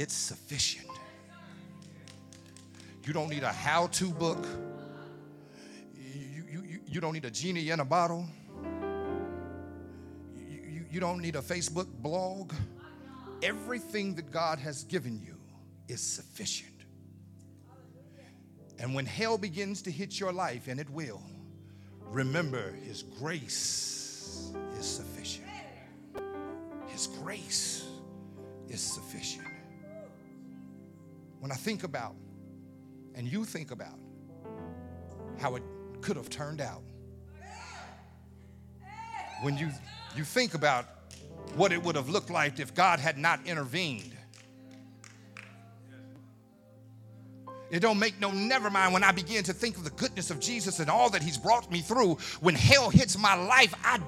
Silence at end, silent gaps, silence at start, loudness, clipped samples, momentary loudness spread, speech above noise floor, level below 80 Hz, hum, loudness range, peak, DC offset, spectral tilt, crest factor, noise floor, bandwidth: 0 s; none; 0 s; -31 LUFS; under 0.1%; 25 LU; 27 dB; -60 dBFS; none; 13 LU; -4 dBFS; under 0.1%; -3.5 dB/octave; 30 dB; -57 dBFS; 16.5 kHz